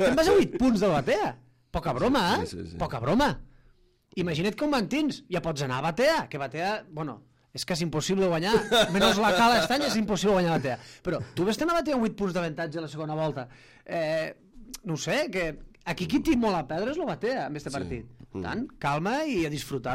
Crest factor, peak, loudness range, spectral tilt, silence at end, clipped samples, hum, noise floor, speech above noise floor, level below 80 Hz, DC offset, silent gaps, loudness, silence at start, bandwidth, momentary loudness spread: 18 dB; -10 dBFS; 7 LU; -5 dB/octave; 0 s; under 0.1%; none; -61 dBFS; 34 dB; -50 dBFS; under 0.1%; none; -27 LUFS; 0 s; 16 kHz; 14 LU